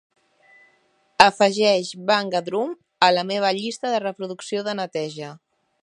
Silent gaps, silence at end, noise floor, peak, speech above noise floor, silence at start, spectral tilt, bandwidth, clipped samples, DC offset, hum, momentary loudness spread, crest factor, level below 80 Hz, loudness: none; 0.45 s; -63 dBFS; 0 dBFS; 41 dB; 1.2 s; -3.5 dB/octave; 11.5 kHz; under 0.1%; under 0.1%; none; 15 LU; 22 dB; -64 dBFS; -21 LUFS